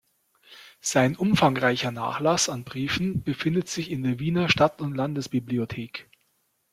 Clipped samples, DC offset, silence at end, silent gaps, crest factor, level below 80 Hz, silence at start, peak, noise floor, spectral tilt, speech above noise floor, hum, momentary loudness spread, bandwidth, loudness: under 0.1%; under 0.1%; 0.7 s; none; 20 dB; -56 dBFS; 0.5 s; -6 dBFS; -71 dBFS; -4.5 dB/octave; 46 dB; none; 10 LU; 15.5 kHz; -25 LUFS